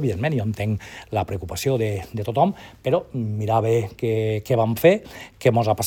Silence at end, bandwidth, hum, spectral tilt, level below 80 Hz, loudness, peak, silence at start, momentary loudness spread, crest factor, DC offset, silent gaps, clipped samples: 0 s; 18 kHz; none; -6.5 dB/octave; -52 dBFS; -23 LUFS; -2 dBFS; 0 s; 10 LU; 20 dB; under 0.1%; none; under 0.1%